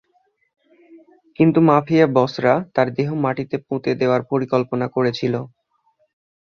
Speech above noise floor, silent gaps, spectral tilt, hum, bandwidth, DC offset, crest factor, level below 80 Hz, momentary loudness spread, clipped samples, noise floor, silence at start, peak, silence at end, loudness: 46 dB; none; -8 dB/octave; none; 7 kHz; under 0.1%; 18 dB; -60 dBFS; 9 LU; under 0.1%; -64 dBFS; 0.95 s; -2 dBFS; 1 s; -19 LUFS